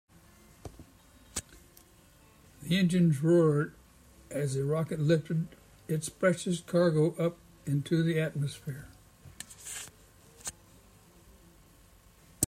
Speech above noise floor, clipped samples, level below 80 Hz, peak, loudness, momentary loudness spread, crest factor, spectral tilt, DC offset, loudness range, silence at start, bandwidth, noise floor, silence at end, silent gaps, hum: 31 dB; under 0.1%; -62 dBFS; -4 dBFS; -30 LUFS; 21 LU; 28 dB; -6 dB/octave; under 0.1%; 15 LU; 0.65 s; 15.5 kHz; -59 dBFS; 0 s; none; none